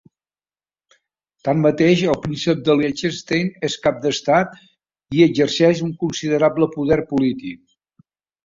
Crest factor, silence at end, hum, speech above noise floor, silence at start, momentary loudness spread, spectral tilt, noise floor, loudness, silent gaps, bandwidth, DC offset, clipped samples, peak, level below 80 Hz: 18 dB; 0.9 s; none; over 72 dB; 1.45 s; 8 LU; -6 dB/octave; under -90 dBFS; -19 LUFS; none; 7.8 kHz; under 0.1%; under 0.1%; -2 dBFS; -52 dBFS